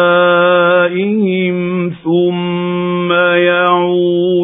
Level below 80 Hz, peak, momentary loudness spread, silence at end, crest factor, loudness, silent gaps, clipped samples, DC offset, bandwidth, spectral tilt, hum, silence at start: -62 dBFS; 0 dBFS; 7 LU; 0 s; 12 dB; -12 LUFS; none; under 0.1%; under 0.1%; 3.9 kHz; -10.5 dB/octave; none; 0 s